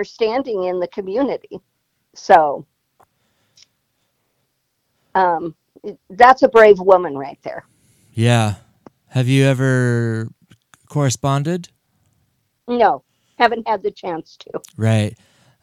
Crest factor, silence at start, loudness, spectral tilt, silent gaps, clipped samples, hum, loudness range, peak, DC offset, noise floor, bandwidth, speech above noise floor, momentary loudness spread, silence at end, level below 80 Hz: 18 dB; 0 s; -17 LUFS; -6 dB/octave; none; under 0.1%; none; 7 LU; 0 dBFS; under 0.1%; -70 dBFS; 14 kHz; 54 dB; 21 LU; 0.5 s; -56 dBFS